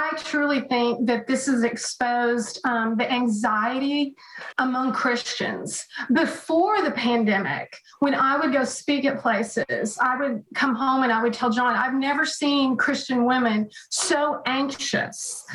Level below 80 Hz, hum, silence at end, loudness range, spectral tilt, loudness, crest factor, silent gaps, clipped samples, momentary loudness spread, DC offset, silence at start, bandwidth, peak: -68 dBFS; none; 0 s; 2 LU; -3.5 dB/octave; -23 LUFS; 14 dB; none; under 0.1%; 6 LU; under 0.1%; 0 s; 12 kHz; -10 dBFS